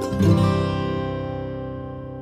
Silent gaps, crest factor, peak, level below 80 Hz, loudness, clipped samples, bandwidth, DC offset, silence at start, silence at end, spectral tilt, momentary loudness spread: none; 16 dB; -6 dBFS; -40 dBFS; -23 LUFS; under 0.1%; 13 kHz; under 0.1%; 0 s; 0 s; -7.5 dB/octave; 14 LU